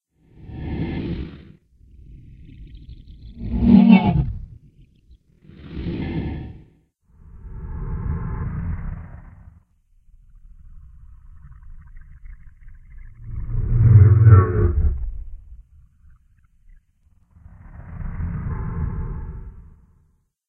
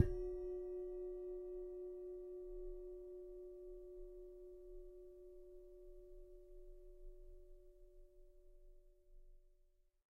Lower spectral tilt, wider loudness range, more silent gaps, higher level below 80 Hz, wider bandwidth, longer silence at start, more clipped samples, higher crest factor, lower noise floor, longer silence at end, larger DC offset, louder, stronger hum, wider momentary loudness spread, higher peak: first, -12 dB/octave vs -9.5 dB/octave; about the same, 18 LU vs 17 LU; neither; first, -32 dBFS vs -58 dBFS; second, 4.5 kHz vs 5.8 kHz; first, 0.45 s vs 0 s; neither; second, 22 dB vs 30 dB; second, -62 dBFS vs -74 dBFS; first, 0.85 s vs 0.4 s; neither; first, -19 LUFS vs -51 LUFS; neither; first, 29 LU vs 18 LU; first, 0 dBFS vs -20 dBFS